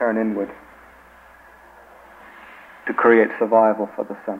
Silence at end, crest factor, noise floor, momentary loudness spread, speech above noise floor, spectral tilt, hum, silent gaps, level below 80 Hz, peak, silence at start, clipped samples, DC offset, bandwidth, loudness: 0 s; 20 dB; -48 dBFS; 25 LU; 29 dB; -8 dB/octave; none; none; -60 dBFS; -2 dBFS; 0 s; under 0.1%; under 0.1%; 4.5 kHz; -19 LUFS